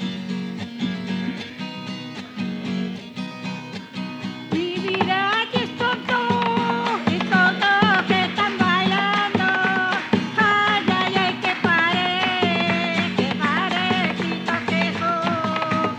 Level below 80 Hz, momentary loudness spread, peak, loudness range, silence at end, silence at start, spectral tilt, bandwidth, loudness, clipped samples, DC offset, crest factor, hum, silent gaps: -62 dBFS; 13 LU; -4 dBFS; 10 LU; 0 s; 0 s; -5.5 dB/octave; 9.2 kHz; -21 LUFS; under 0.1%; under 0.1%; 18 dB; none; none